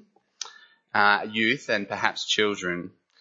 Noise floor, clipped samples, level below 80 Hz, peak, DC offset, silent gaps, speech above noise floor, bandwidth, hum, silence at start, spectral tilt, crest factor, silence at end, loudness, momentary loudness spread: -50 dBFS; under 0.1%; -72 dBFS; -4 dBFS; under 0.1%; none; 26 dB; 8 kHz; none; 0.4 s; -3 dB/octave; 22 dB; 0.3 s; -24 LUFS; 18 LU